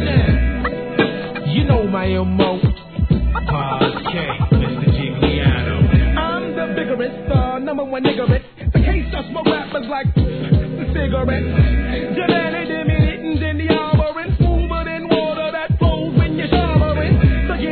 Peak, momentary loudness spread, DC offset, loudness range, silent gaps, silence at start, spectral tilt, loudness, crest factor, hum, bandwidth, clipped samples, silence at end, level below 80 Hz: 0 dBFS; 6 LU; 0.3%; 2 LU; none; 0 s; -11 dB/octave; -18 LUFS; 16 dB; none; 4.5 kHz; under 0.1%; 0 s; -24 dBFS